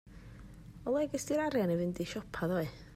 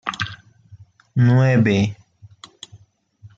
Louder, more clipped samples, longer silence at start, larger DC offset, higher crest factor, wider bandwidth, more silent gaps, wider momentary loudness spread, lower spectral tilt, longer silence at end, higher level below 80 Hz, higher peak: second, -35 LUFS vs -18 LUFS; neither; about the same, 0.05 s vs 0.05 s; neither; about the same, 14 dB vs 16 dB; first, 16 kHz vs 7.6 kHz; neither; second, 21 LU vs 25 LU; second, -6 dB/octave vs -7.5 dB/octave; about the same, 0 s vs 0.1 s; about the same, -56 dBFS vs -56 dBFS; second, -22 dBFS vs -4 dBFS